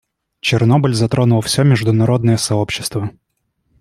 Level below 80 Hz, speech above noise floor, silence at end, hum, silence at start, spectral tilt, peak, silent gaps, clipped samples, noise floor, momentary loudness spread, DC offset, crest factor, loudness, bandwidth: -48 dBFS; 52 dB; 0.7 s; none; 0.45 s; -5.5 dB/octave; -2 dBFS; none; under 0.1%; -66 dBFS; 8 LU; under 0.1%; 14 dB; -15 LUFS; 15 kHz